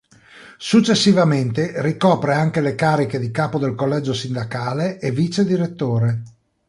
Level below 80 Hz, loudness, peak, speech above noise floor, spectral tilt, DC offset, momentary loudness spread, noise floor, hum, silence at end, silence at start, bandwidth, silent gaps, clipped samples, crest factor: -56 dBFS; -19 LUFS; -2 dBFS; 27 dB; -6 dB/octave; under 0.1%; 9 LU; -45 dBFS; none; 0.4 s; 0.35 s; 11.5 kHz; none; under 0.1%; 16 dB